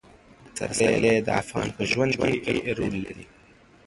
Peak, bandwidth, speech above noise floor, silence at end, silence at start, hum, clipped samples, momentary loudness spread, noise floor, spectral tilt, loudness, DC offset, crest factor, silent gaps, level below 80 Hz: -6 dBFS; 11.5 kHz; 30 dB; 0.65 s; 0.45 s; none; under 0.1%; 13 LU; -54 dBFS; -4.5 dB/octave; -25 LUFS; under 0.1%; 20 dB; none; -50 dBFS